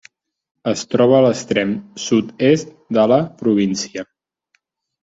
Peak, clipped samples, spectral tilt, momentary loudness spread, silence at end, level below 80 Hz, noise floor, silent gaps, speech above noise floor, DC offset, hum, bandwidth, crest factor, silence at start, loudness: -2 dBFS; under 0.1%; -5.5 dB/octave; 12 LU; 1 s; -58 dBFS; -66 dBFS; none; 50 dB; under 0.1%; none; 8 kHz; 16 dB; 0.65 s; -17 LUFS